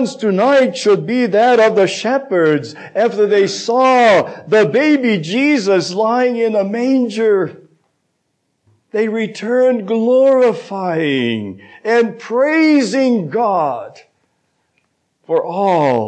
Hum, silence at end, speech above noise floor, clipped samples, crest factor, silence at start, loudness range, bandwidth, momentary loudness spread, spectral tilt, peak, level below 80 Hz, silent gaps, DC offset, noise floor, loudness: none; 0 s; 54 dB; under 0.1%; 12 dB; 0 s; 5 LU; 9 kHz; 9 LU; -5.5 dB/octave; -4 dBFS; -72 dBFS; none; under 0.1%; -68 dBFS; -14 LUFS